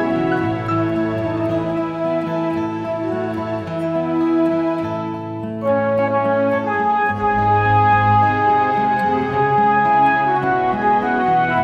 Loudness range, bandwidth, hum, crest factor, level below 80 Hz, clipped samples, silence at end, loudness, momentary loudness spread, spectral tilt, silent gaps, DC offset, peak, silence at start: 6 LU; 7.4 kHz; none; 14 dB; -46 dBFS; under 0.1%; 0 s; -18 LUFS; 9 LU; -8.5 dB/octave; none; under 0.1%; -4 dBFS; 0 s